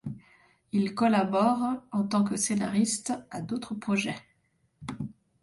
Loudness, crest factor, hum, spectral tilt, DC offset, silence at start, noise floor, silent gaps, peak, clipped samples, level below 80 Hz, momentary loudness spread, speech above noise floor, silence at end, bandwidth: -28 LUFS; 18 dB; none; -5 dB/octave; under 0.1%; 0.05 s; -71 dBFS; none; -12 dBFS; under 0.1%; -64 dBFS; 17 LU; 44 dB; 0.3 s; 11.5 kHz